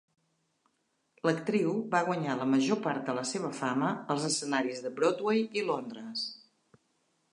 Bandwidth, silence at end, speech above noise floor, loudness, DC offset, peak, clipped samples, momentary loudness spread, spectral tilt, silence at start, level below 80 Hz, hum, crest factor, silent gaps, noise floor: 11 kHz; 0.95 s; 46 dB; -31 LUFS; under 0.1%; -12 dBFS; under 0.1%; 8 LU; -4.5 dB/octave; 1.25 s; -84 dBFS; none; 20 dB; none; -77 dBFS